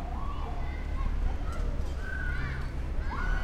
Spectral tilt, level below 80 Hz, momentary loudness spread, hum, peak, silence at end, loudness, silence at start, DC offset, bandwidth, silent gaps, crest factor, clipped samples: -6.5 dB/octave; -32 dBFS; 3 LU; none; -18 dBFS; 0 s; -36 LUFS; 0 s; under 0.1%; 8.6 kHz; none; 12 dB; under 0.1%